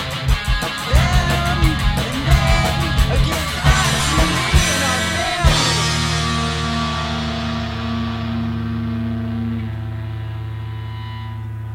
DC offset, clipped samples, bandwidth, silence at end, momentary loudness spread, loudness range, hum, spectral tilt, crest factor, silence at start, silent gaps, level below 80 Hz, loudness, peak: under 0.1%; under 0.1%; 16.5 kHz; 0 s; 12 LU; 8 LU; none; -4 dB/octave; 18 dB; 0 s; none; -24 dBFS; -19 LUFS; 0 dBFS